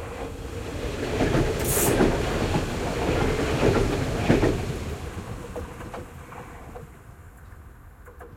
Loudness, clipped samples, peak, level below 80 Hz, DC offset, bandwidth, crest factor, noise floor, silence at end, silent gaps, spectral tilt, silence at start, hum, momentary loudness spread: -25 LUFS; under 0.1%; -6 dBFS; -36 dBFS; under 0.1%; 16.5 kHz; 20 dB; -46 dBFS; 0 s; none; -5 dB/octave; 0 s; none; 20 LU